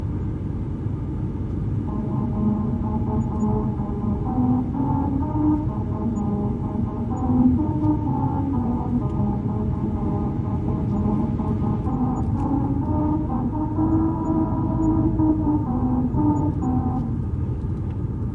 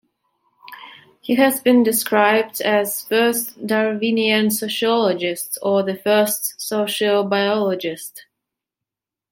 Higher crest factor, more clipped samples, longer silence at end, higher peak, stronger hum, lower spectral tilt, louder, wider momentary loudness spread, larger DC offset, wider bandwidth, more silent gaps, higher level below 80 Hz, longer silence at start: about the same, 16 dB vs 18 dB; neither; second, 0 s vs 1.1 s; second, -6 dBFS vs -2 dBFS; neither; first, -11 dB/octave vs -3.5 dB/octave; second, -23 LUFS vs -18 LUFS; about the same, 7 LU vs 9 LU; neither; second, 7.4 kHz vs 17 kHz; neither; first, -34 dBFS vs -70 dBFS; second, 0 s vs 0.65 s